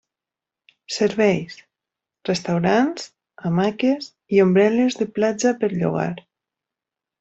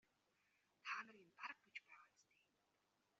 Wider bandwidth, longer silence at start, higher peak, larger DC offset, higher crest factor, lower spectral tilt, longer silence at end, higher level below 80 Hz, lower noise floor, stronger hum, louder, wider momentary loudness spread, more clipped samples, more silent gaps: first, 8.2 kHz vs 7.2 kHz; about the same, 0.9 s vs 0.85 s; first, -4 dBFS vs -36 dBFS; neither; second, 18 dB vs 24 dB; first, -6 dB/octave vs 1.5 dB/octave; about the same, 1 s vs 1 s; first, -60 dBFS vs under -90 dBFS; about the same, -88 dBFS vs -85 dBFS; neither; first, -20 LUFS vs -54 LUFS; about the same, 14 LU vs 15 LU; neither; neither